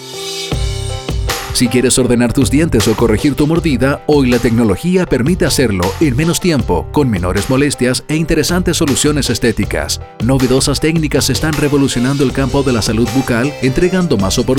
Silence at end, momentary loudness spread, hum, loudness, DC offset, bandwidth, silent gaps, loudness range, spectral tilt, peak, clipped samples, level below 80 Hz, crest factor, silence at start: 0 s; 6 LU; none; -13 LUFS; under 0.1%; 18.5 kHz; none; 1 LU; -5 dB/octave; -2 dBFS; under 0.1%; -26 dBFS; 12 dB; 0 s